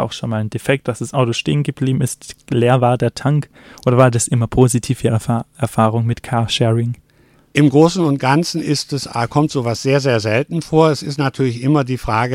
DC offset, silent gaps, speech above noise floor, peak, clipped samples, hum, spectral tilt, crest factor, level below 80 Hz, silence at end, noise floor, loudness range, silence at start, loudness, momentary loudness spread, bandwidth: under 0.1%; none; 36 dB; 0 dBFS; under 0.1%; none; -6 dB/octave; 16 dB; -44 dBFS; 0 s; -52 dBFS; 2 LU; 0 s; -17 LUFS; 8 LU; 15.5 kHz